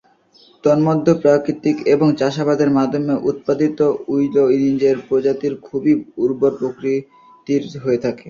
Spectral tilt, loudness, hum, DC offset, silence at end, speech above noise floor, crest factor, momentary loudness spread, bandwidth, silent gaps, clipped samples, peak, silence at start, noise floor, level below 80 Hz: -7.5 dB/octave; -17 LUFS; none; under 0.1%; 0 s; 35 dB; 16 dB; 7 LU; 7.2 kHz; none; under 0.1%; -2 dBFS; 0.65 s; -51 dBFS; -58 dBFS